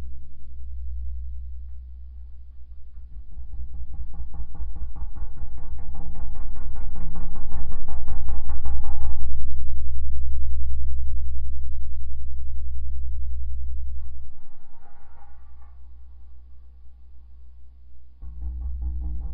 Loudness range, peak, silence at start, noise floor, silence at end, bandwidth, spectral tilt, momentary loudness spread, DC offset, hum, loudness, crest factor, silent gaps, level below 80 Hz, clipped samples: 13 LU; -2 dBFS; 0 s; -40 dBFS; 0 s; 1.2 kHz; -11 dB/octave; 19 LU; under 0.1%; none; -35 LUFS; 12 dB; none; -30 dBFS; under 0.1%